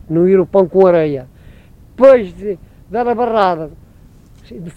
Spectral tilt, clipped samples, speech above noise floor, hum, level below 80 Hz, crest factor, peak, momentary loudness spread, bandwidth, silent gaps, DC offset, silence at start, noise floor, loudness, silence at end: -8.5 dB/octave; 0.2%; 30 dB; none; -44 dBFS; 14 dB; 0 dBFS; 17 LU; 5.8 kHz; none; under 0.1%; 0.1 s; -42 dBFS; -13 LUFS; 0.05 s